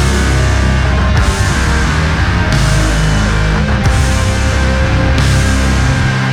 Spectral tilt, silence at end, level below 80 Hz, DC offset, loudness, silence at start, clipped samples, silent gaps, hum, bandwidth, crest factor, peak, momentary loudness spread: -5 dB/octave; 0 s; -14 dBFS; under 0.1%; -12 LUFS; 0 s; under 0.1%; none; none; 13 kHz; 10 dB; 0 dBFS; 1 LU